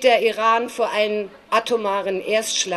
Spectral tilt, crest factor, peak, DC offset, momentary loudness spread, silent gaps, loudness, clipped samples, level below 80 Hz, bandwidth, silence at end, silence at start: -1.5 dB/octave; 16 dB; -4 dBFS; under 0.1%; 6 LU; none; -20 LUFS; under 0.1%; -64 dBFS; 13 kHz; 0 s; 0 s